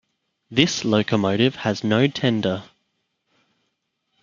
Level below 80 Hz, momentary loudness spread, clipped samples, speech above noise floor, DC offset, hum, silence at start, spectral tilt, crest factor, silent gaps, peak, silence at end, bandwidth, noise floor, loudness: -60 dBFS; 6 LU; under 0.1%; 54 dB; under 0.1%; none; 0.5 s; -5 dB/octave; 22 dB; none; 0 dBFS; 1.6 s; 7.4 kHz; -75 dBFS; -21 LUFS